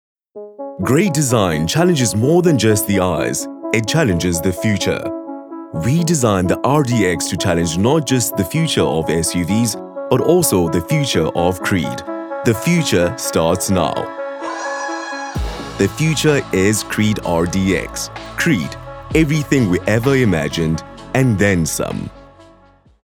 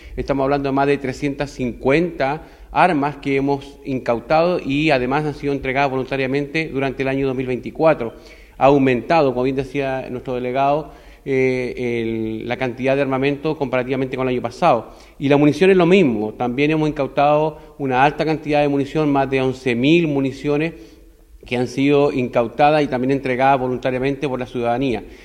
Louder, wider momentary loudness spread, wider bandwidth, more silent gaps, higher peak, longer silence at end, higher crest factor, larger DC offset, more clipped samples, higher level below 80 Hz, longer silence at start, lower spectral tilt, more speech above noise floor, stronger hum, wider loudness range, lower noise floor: about the same, -17 LUFS vs -19 LUFS; first, 11 LU vs 8 LU; first, 19 kHz vs 11 kHz; neither; about the same, 0 dBFS vs 0 dBFS; first, 0.65 s vs 0 s; about the same, 16 dB vs 18 dB; neither; neither; first, -38 dBFS vs -44 dBFS; first, 0.35 s vs 0 s; second, -5 dB/octave vs -7 dB/octave; first, 33 dB vs 27 dB; neither; about the same, 3 LU vs 4 LU; first, -49 dBFS vs -45 dBFS